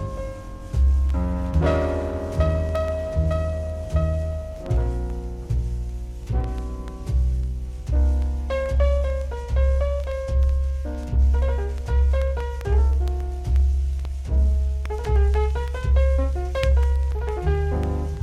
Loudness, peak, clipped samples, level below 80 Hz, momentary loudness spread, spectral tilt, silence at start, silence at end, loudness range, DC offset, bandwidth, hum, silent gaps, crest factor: -24 LUFS; -8 dBFS; under 0.1%; -22 dBFS; 9 LU; -8 dB/octave; 0 s; 0 s; 4 LU; under 0.1%; 7.4 kHz; none; none; 14 dB